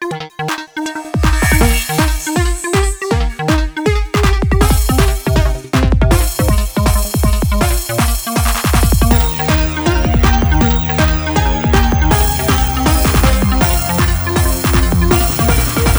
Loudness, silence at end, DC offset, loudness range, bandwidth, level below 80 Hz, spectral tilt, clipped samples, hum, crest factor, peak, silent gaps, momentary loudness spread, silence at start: -14 LUFS; 0 s; under 0.1%; 2 LU; over 20 kHz; -16 dBFS; -5 dB/octave; under 0.1%; none; 12 dB; 0 dBFS; none; 4 LU; 0 s